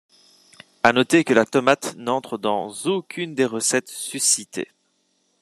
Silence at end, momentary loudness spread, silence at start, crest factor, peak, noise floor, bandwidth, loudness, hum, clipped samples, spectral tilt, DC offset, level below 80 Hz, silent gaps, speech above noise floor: 0.75 s; 12 LU; 0.85 s; 22 dB; 0 dBFS; -68 dBFS; 13.5 kHz; -21 LUFS; none; under 0.1%; -3 dB/octave; under 0.1%; -66 dBFS; none; 47 dB